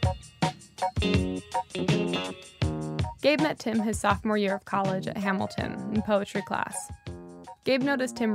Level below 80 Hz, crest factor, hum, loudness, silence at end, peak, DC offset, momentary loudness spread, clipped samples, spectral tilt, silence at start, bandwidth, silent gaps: -46 dBFS; 20 dB; none; -28 LUFS; 0 s; -8 dBFS; under 0.1%; 8 LU; under 0.1%; -5.5 dB/octave; 0 s; 15.5 kHz; none